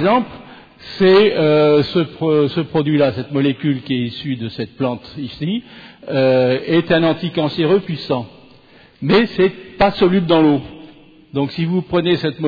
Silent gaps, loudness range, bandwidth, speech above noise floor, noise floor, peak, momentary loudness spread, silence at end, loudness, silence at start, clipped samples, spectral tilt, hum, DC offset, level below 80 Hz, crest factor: none; 5 LU; 5 kHz; 31 dB; -46 dBFS; -4 dBFS; 12 LU; 0 s; -16 LUFS; 0 s; under 0.1%; -8.5 dB/octave; none; under 0.1%; -48 dBFS; 14 dB